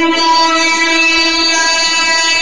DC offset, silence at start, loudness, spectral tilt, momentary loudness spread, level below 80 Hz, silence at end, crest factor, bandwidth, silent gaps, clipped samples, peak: 3%; 0 s; -9 LUFS; 0.5 dB/octave; 1 LU; -46 dBFS; 0 s; 10 dB; 10.5 kHz; none; under 0.1%; 0 dBFS